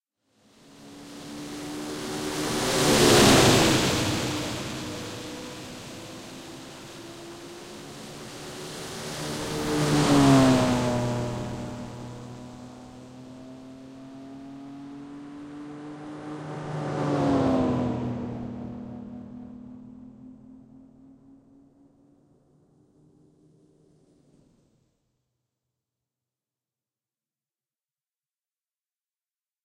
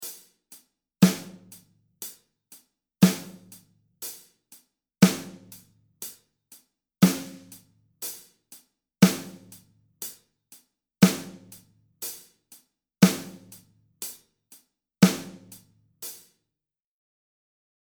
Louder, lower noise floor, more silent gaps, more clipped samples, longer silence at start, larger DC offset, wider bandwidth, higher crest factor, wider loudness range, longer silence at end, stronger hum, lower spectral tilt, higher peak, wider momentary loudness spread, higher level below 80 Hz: about the same, -24 LUFS vs -25 LUFS; about the same, under -90 dBFS vs -89 dBFS; neither; neither; first, 0.7 s vs 0 s; neither; second, 16 kHz vs over 20 kHz; second, 22 dB vs 28 dB; first, 21 LU vs 3 LU; first, 8.85 s vs 1.65 s; neither; about the same, -4.5 dB/octave vs -5 dB/octave; second, -8 dBFS vs -2 dBFS; about the same, 25 LU vs 25 LU; first, -50 dBFS vs -68 dBFS